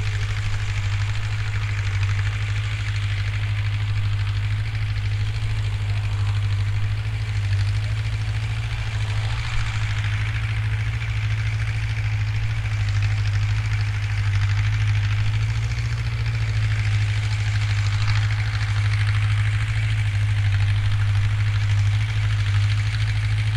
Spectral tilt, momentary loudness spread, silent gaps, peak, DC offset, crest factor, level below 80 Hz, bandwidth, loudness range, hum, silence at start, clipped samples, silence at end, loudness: -5 dB/octave; 4 LU; none; -10 dBFS; under 0.1%; 12 dB; -30 dBFS; 9.8 kHz; 3 LU; none; 0 s; under 0.1%; 0 s; -23 LUFS